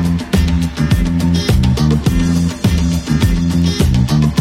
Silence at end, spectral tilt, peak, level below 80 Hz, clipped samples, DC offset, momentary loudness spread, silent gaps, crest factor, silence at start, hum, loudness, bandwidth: 0 s; -6.5 dB/octave; 0 dBFS; -20 dBFS; under 0.1%; under 0.1%; 2 LU; none; 12 dB; 0 s; none; -14 LUFS; 16 kHz